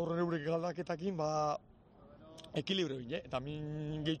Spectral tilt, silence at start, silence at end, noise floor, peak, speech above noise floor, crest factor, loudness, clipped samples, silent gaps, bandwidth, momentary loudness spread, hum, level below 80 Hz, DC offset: -6 dB/octave; 0 s; 0 s; -60 dBFS; -22 dBFS; 23 dB; 16 dB; -38 LUFS; under 0.1%; none; 9 kHz; 7 LU; none; -64 dBFS; under 0.1%